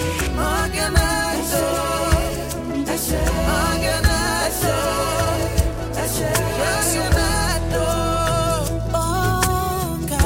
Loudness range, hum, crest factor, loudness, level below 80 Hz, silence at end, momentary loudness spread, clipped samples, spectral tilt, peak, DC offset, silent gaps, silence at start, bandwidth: 1 LU; none; 18 dB; -20 LUFS; -26 dBFS; 0 s; 4 LU; under 0.1%; -4 dB/octave; -2 dBFS; 0.3%; none; 0 s; 17 kHz